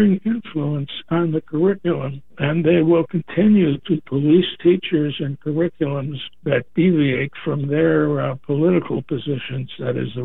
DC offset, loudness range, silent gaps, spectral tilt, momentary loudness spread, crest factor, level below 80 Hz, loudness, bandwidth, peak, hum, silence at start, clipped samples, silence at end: 0.8%; 3 LU; none; -11 dB/octave; 9 LU; 14 dB; -52 dBFS; -20 LUFS; 4 kHz; -4 dBFS; none; 0 s; under 0.1%; 0 s